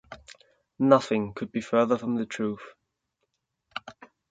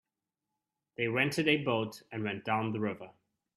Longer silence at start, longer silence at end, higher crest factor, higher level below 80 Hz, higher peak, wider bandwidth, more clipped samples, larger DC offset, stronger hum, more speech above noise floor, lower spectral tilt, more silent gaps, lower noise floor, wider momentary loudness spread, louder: second, 0.1 s vs 1 s; about the same, 0.4 s vs 0.45 s; about the same, 26 dB vs 22 dB; first, -66 dBFS vs -74 dBFS; first, -2 dBFS vs -12 dBFS; second, 9.2 kHz vs 14.5 kHz; neither; neither; neither; about the same, 54 dB vs 57 dB; about the same, -6.5 dB/octave vs -5.5 dB/octave; neither; second, -79 dBFS vs -89 dBFS; first, 19 LU vs 11 LU; first, -26 LUFS vs -32 LUFS